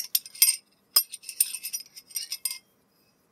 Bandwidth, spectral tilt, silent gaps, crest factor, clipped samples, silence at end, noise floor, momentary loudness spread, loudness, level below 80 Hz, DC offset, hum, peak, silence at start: 16.5 kHz; 5 dB/octave; none; 28 dB; under 0.1%; 0.75 s; -66 dBFS; 15 LU; -26 LUFS; -90 dBFS; under 0.1%; none; -2 dBFS; 0 s